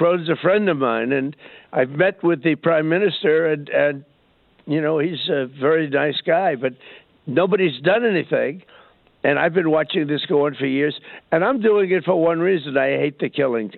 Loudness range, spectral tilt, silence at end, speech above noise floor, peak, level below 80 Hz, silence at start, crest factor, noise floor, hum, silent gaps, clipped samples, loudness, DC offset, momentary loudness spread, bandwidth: 2 LU; -10.5 dB/octave; 0 s; 39 dB; -4 dBFS; -68 dBFS; 0 s; 16 dB; -58 dBFS; none; none; under 0.1%; -20 LUFS; under 0.1%; 6 LU; 4.4 kHz